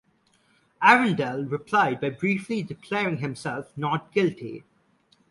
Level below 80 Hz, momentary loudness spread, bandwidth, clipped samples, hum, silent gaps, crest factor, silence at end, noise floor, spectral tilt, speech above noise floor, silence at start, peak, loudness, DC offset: -66 dBFS; 15 LU; 11.5 kHz; under 0.1%; none; none; 24 dB; 0.7 s; -65 dBFS; -6 dB/octave; 40 dB; 0.8 s; -2 dBFS; -24 LUFS; under 0.1%